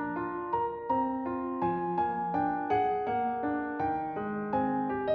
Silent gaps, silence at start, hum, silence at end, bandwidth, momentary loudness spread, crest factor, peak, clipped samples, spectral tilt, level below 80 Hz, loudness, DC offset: none; 0 s; none; 0 s; 5.4 kHz; 5 LU; 14 dB; -16 dBFS; under 0.1%; -9 dB/octave; -62 dBFS; -31 LUFS; under 0.1%